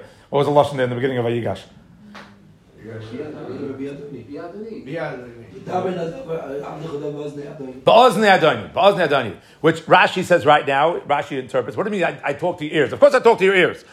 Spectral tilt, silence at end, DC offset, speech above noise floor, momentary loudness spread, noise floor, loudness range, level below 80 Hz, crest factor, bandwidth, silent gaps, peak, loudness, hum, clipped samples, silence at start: -5.5 dB/octave; 0.1 s; under 0.1%; 29 dB; 19 LU; -48 dBFS; 16 LU; -60 dBFS; 18 dB; 14 kHz; none; 0 dBFS; -18 LUFS; none; under 0.1%; 0 s